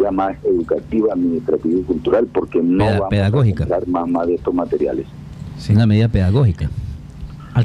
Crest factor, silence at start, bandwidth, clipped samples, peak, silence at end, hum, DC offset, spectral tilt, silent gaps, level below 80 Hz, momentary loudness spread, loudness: 14 dB; 0 s; 9.8 kHz; under 0.1%; -4 dBFS; 0 s; none; under 0.1%; -9 dB/octave; none; -36 dBFS; 14 LU; -17 LUFS